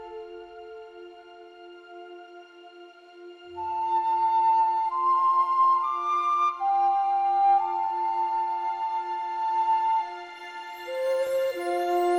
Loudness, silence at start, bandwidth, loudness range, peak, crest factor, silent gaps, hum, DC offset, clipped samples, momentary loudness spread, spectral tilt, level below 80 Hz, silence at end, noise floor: -25 LUFS; 0 s; 16 kHz; 15 LU; -14 dBFS; 12 dB; none; none; under 0.1%; under 0.1%; 22 LU; -3.5 dB/octave; -74 dBFS; 0 s; -49 dBFS